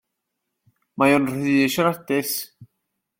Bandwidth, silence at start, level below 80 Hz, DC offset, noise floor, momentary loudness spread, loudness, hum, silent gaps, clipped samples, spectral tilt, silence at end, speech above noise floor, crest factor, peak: 16.5 kHz; 0.95 s; -64 dBFS; under 0.1%; -79 dBFS; 12 LU; -21 LUFS; none; none; under 0.1%; -4.5 dB/octave; 0.55 s; 59 dB; 18 dB; -4 dBFS